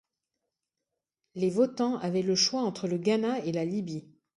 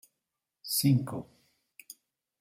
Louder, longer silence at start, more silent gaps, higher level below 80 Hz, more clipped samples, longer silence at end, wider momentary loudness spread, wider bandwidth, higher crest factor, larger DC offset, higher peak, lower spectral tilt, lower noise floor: about the same, -29 LUFS vs -29 LUFS; first, 1.35 s vs 0.65 s; neither; about the same, -74 dBFS vs -72 dBFS; neither; second, 0.35 s vs 1.15 s; second, 10 LU vs 25 LU; second, 11.5 kHz vs 16.5 kHz; about the same, 18 dB vs 18 dB; neither; about the same, -12 dBFS vs -14 dBFS; about the same, -4.5 dB/octave vs -5 dB/octave; about the same, -87 dBFS vs -87 dBFS